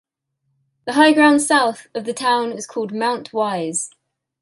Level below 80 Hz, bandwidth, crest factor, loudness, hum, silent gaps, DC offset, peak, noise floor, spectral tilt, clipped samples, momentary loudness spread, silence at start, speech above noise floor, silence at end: -72 dBFS; 11.5 kHz; 18 dB; -18 LUFS; none; none; under 0.1%; -2 dBFS; -72 dBFS; -3 dB/octave; under 0.1%; 14 LU; 0.85 s; 55 dB; 0.55 s